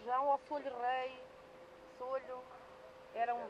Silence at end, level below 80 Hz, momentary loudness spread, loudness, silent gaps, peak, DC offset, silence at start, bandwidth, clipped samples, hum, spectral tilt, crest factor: 0 s; -78 dBFS; 21 LU; -40 LUFS; none; -22 dBFS; under 0.1%; 0 s; 10.5 kHz; under 0.1%; none; -4.5 dB/octave; 18 dB